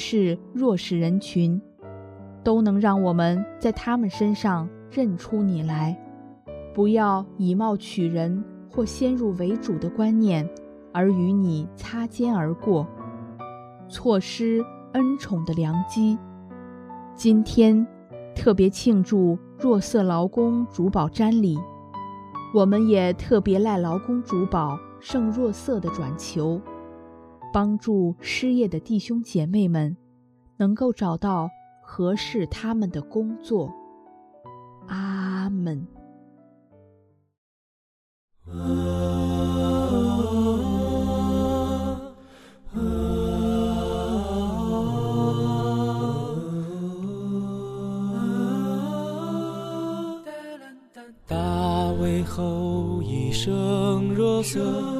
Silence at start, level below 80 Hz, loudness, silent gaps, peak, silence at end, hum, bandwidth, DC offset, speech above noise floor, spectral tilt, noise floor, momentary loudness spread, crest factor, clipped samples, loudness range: 0 s; -44 dBFS; -24 LUFS; 37.38-38.28 s; -4 dBFS; 0 s; none; 14 kHz; under 0.1%; 37 dB; -7 dB/octave; -59 dBFS; 15 LU; 20 dB; under 0.1%; 7 LU